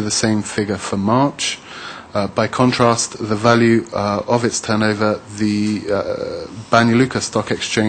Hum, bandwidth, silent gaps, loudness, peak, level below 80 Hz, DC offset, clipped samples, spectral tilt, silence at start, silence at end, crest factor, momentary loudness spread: none; 9.4 kHz; none; -17 LUFS; -2 dBFS; -50 dBFS; under 0.1%; under 0.1%; -4.5 dB/octave; 0 s; 0 s; 16 dB; 10 LU